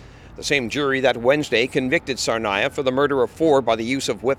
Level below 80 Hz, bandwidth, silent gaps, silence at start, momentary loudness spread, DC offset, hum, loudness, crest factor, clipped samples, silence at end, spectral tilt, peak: -50 dBFS; 15 kHz; none; 0 s; 4 LU; under 0.1%; none; -20 LUFS; 16 dB; under 0.1%; 0 s; -4 dB/octave; -4 dBFS